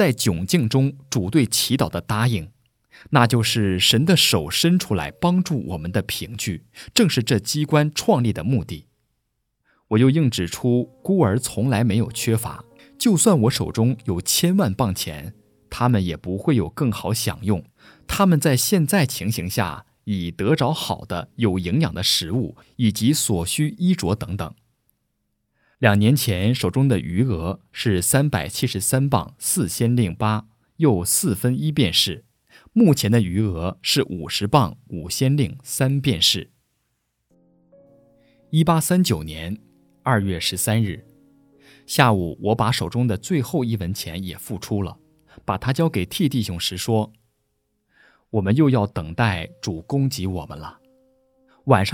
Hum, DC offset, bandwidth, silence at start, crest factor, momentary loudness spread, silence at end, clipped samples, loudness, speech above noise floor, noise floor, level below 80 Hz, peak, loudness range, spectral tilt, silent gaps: none; under 0.1%; 18.5 kHz; 0 s; 22 dB; 11 LU; 0 s; under 0.1%; -21 LUFS; 54 dB; -74 dBFS; -46 dBFS; 0 dBFS; 5 LU; -5 dB/octave; none